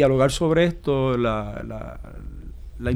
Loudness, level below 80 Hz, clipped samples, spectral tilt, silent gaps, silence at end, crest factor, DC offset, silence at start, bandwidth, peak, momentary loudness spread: -22 LUFS; -36 dBFS; under 0.1%; -6.5 dB/octave; none; 0 s; 16 dB; under 0.1%; 0 s; 15 kHz; -6 dBFS; 20 LU